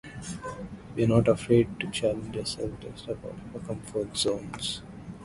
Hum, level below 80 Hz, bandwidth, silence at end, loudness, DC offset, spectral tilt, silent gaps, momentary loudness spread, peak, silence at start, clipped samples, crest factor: none; -50 dBFS; 11.5 kHz; 0 s; -29 LUFS; under 0.1%; -5.5 dB/octave; none; 16 LU; -8 dBFS; 0.05 s; under 0.1%; 22 dB